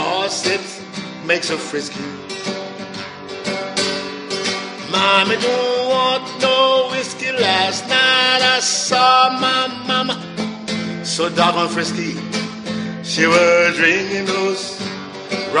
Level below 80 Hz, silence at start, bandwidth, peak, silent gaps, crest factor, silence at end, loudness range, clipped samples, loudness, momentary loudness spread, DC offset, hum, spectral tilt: -60 dBFS; 0 s; 10.5 kHz; 0 dBFS; none; 18 dB; 0 s; 8 LU; under 0.1%; -17 LUFS; 14 LU; under 0.1%; none; -2.5 dB/octave